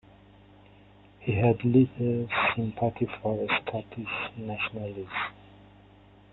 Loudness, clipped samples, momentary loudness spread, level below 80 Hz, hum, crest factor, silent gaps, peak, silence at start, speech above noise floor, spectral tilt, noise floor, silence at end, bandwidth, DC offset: -28 LUFS; under 0.1%; 12 LU; -58 dBFS; 50 Hz at -50 dBFS; 20 dB; none; -10 dBFS; 1.2 s; 27 dB; -10 dB/octave; -55 dBFS; 0.9 s; 4.2 kHz; under 0.1%